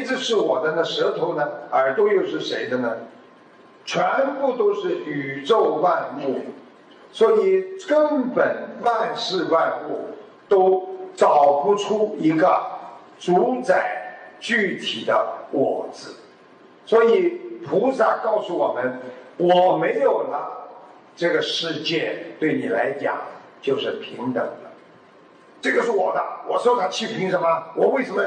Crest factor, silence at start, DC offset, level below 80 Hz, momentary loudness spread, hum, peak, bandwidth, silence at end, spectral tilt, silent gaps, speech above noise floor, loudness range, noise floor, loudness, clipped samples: 16 dB; 0 s; under 0.1%; -80 dBFS; 14 LU; none; -6 dBFS; 9.6 kHz; 0 s; -5 dB/octave; none; 29 dB; 5 LU; -50 dBFS; -21 LUFS; under 0.1%